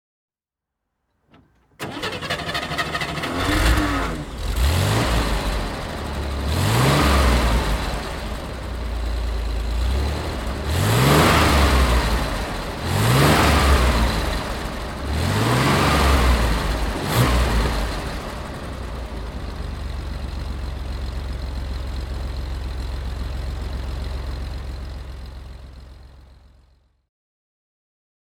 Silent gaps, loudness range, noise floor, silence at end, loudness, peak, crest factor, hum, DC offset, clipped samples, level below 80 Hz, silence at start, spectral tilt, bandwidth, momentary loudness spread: none; 12 LU; -86 dBFS; 2.05 s; -22 LUFS; -2 dBFS; 20 dB; none; under 0.1%; under 0.1%; -26 dBFS; 1.8 s; -5 dB/octave; 17.5 kHz; 15 LU